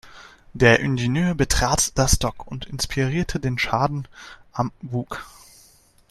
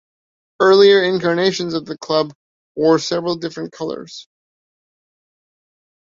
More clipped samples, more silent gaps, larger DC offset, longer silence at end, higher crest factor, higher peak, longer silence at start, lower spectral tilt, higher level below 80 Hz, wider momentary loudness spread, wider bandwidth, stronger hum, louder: neither; second, none vs 2.35-2.75 s; neither; second, 0.8 s vs 1.9 s; about the same, 22 dB vs 18 dB; about the same, 0 dBFS vs -2 dBFS; second, 0.05 s vs 0.6 s; about the same, -4 dB/octave vs -5 dB/octave; first, -34 dBFS vs -62 dBFS; about the same, 17 LU vs 17 LU; first, 14 kHz vs 7.6 kHz; neither; second, -21 LUFS vs -17 LUFS